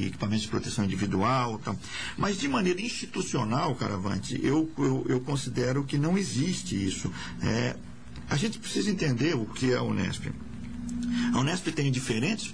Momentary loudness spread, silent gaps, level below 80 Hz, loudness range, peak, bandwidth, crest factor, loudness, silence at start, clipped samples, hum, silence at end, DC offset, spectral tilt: 8 LU; none; -50 dBFS; 1 LU; -16 dBFS; 10.5 kHz; 12 dB; -29 LUFS; 0 s; under 0.1%; none; 0 s; 0.6%; -5.5 dB/octave